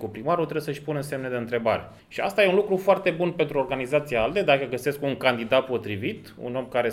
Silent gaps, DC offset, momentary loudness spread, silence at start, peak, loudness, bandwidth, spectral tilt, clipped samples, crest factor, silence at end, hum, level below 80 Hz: none; under 0.1%; 9 LU; 0 s; -4 dBFS; -25 LUFS; 16 kHz; -6 dB/octave; under 0.1%; 20 dB; 0 s; none; -56 dBFS